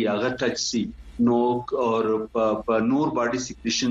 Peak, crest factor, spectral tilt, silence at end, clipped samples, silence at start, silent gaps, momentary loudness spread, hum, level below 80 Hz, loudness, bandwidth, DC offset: -10 dBFS; 14 dB; -4.5 dB/octave; 0 s; under 0.1%; 0 s; none; 5 LU; none; -50 dBFS; -24 LUFS; 7.8 kHz; under 0.1%